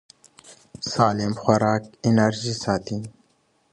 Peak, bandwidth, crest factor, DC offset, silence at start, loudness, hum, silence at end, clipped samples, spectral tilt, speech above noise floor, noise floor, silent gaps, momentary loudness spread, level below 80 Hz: -4 dBFS; 11 kHz; 20 dB; under 0.1%; 0.5 s; -23 LUFS; none; 0.6 s; under 0.1%; -5.5 dB/octave; 43 dB; -65 dBFS; none; 13 LU; -56 dBFS